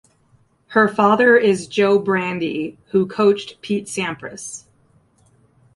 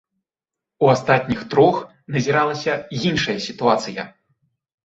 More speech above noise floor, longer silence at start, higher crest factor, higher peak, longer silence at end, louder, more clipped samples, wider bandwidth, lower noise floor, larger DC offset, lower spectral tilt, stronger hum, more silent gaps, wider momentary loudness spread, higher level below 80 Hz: second, 40 dB vs 68 dB; about the same, 0.7 s vs 0.8 s; about the same, 18 dB vs 18 dB; about the same, -2 dBFS vs -2 dBFS; first, 1.15 s vs 0.75 s; about the same, -18 LUFS vs -19 LUFS; neither; first, 11.5 kHz vs 8 kHz; second, -58 dBFS vs -87 dBFS; neither; about the same, -5 dB/octave vs -5.5 dB/octave; neither; neither; first, 17 LU vs 11 LU; second, -62 dBFS vs -54 dBFS